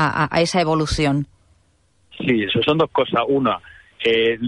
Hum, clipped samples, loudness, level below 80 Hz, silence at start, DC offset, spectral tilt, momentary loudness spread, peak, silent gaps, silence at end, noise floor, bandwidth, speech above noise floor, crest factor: none; under 0.1%; -19 LUFS; -40 dBFS; 0 s; under 0.1%; -5.5 dB/octave; 7 LU; -6 dBFS; none; 0 s; -61 dBFS; 11.5 kHz; 42 dB; 14 dB